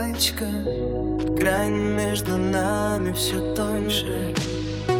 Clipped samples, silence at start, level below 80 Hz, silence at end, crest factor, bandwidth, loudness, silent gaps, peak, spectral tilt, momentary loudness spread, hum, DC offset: under 0.1%; 0 s; -38 dBFS; 0 s; 16 dB; 18 kHz; -24 LUFS; none; -8 dBFS; -4.5 dB/octave; 5 LU; none; under 0.1%